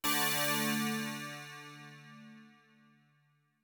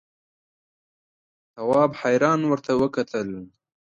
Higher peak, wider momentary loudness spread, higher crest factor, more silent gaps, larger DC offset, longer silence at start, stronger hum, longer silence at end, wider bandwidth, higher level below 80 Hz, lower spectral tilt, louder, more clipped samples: second, -18 dBFS vs -6 dBFS; first, 24 LU vs 11 LU; about the same, 20 dB vs 20 dB; neither; neither; second, 0.05 s vs 1.55 s; neither; first, 1.15 s vs 0.4 s; first, 19 kHz vs 9.6 kHz; second, -78 dBFS vs -64 dBFS; second, -2.5 dB/octave vs -6.5 dB/octave; second, -33 LUFS vs -22 LUFS; neither